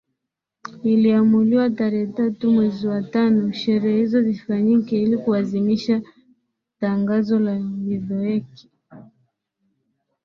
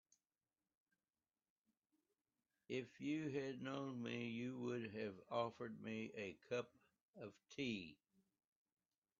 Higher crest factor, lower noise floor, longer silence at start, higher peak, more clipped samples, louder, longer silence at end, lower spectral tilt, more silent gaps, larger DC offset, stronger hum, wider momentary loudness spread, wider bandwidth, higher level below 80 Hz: second, 14 dB vs 22 dB; second, -82 dBFS vs under -90 dBFS; second, 0.65 s vs 2.7 s; first, -6 dBFS vs -28 dBFS; neither; first, -20 LUFS vs -48 LUFS; about the same, 1.25 s vs 1.25 s; first, -8.5 dB/octave vs -4.5 dB/octave; second, none vs 7.01-7.13 s; neither; neither; about the same, 9 LU vs 10 LU; second, 6.4 kHz vs 7.2 kHz; first, -62 dBFS vs -88 dBFS